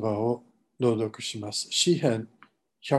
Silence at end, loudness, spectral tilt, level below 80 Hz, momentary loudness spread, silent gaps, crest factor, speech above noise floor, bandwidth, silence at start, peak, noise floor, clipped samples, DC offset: 0 s; -27 LUFS; -4.5 dB/octave; -68 dBFS; 12 LU; none; 20 dB; 33 dB; 12.5 kHz; 0 s; -8 dBFS; -60 dBFS; under 0.1%; under 0.1%